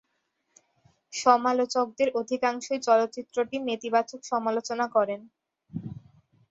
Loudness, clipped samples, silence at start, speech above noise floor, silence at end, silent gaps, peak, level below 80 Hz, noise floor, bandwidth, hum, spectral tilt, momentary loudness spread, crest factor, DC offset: -26 LUFS; under 0.1%; 1.1 s; 50 dB; 0.55 s; none; -6 dBFS; -70 dBFS; -76 dBFS; 8 kHz; none; -4 dB/octave; 16 LU; 22 dB; under 0.1%